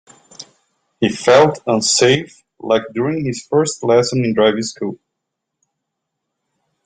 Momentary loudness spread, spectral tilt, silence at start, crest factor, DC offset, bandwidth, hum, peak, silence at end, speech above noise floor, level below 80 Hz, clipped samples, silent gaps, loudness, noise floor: 14 LU; -4 dB/octave; 0.4 s; 16 dB; under 0.1%; 9.6 kHz; none; -2 dBFS; 1.9 s; 63 dB; -58 dBFS; under 0.1%; none; -16 LUFS; -78 dBFS